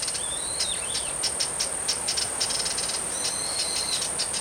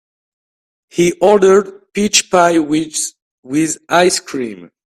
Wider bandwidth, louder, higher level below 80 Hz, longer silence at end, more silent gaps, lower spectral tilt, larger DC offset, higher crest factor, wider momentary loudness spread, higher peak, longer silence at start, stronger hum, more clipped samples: first, 18 kHz vs 15 kHz; second, -25 LUFS vs -14 LUFS; about the same, -52 dBFS vs -54 dBFS; second, 0 s vs 0.3 s; second, none vs 3.22-3.43 s; second, 0.5 dB/octave vs -3.5 dB/octave; neither; about the same, 16 dB vs 16 dB; second, 2 LU vs 13 LU; second, -12 dBFS vs 0 dBFS; second, 0 s vs 0.95 s; neither; neither